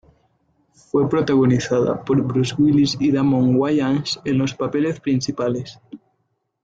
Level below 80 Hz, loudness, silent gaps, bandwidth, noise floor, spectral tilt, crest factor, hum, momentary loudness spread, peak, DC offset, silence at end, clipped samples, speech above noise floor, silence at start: -54 dBFS; -19 LUFS; none; 9 kHz; -71 dBFS; -6.5 dB/octave; 12 dB; none; 6 LU; -6 dBFS; under 0.1%; 0.65 s; under 0.1%; 52 dB; 0.95 s